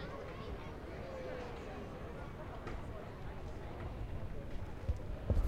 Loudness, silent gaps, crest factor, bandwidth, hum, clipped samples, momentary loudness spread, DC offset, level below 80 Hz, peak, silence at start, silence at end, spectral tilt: -46 LUFS; none; 20 dB; 15 kHz; none; under 0.1%; 5 LU; under 0.1%; -46 dBFS; -22 dBFS; 0 s; 0 s; -7.5 dB/octave